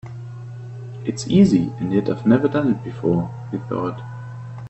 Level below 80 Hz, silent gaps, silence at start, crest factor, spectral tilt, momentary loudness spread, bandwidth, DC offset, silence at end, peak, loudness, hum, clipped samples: -52 dBFS; none; 0.05 s; 18 dB; -7.5 dB/octave; 19 LU; 8.4 kHz; under 0.1%; 0 s; -2 dBFS; -20 LUFS; none; under 0.1%